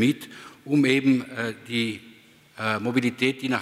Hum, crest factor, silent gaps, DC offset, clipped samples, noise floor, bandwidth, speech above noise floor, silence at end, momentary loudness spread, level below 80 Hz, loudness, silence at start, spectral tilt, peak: none; 18 dB; none; under 0.1%; under 0.1%; -52 dBFS; 14.5 kHz; 28 dB; 0 s; 14 LU; -70 dBFS; -24 LUFS; 0 s; -5.5 dB/octave; -8 dBFS